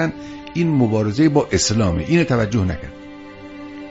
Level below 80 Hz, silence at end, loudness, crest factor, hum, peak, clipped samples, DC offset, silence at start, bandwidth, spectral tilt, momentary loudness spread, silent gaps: -38 dBFS; 0 s; -18 LUFS; 16 dB; none; -2 dBFS; under 0.1%; under 0.1%; 0 s; 8 kHz; -5.5 dB/octave; 20 LU; none